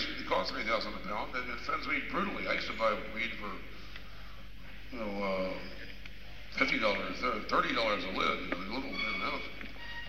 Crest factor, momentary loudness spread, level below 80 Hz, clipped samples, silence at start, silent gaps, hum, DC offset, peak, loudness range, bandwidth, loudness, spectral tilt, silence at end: 24 dB; 18 LU; -52 dBFS; under 0.1%; 0 s; none; none; 0.7%; -12 dBFS; 7 LU; 16 kHz; -34 LUFS; -4.5 dB/octave; 0 s